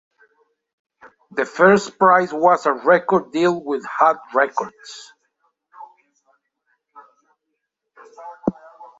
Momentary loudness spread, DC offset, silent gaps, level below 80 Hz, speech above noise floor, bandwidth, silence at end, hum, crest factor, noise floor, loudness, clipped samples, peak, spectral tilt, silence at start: 20 LU; under 0.1%; none; -66 dBFS; 60 dB; 8 kHz; 0.15 s; none; 20 dB; -77 dBFS; -18 LUFS; under 0.1%; -2 dBFS; -5.5 dB/octave; 1.35 s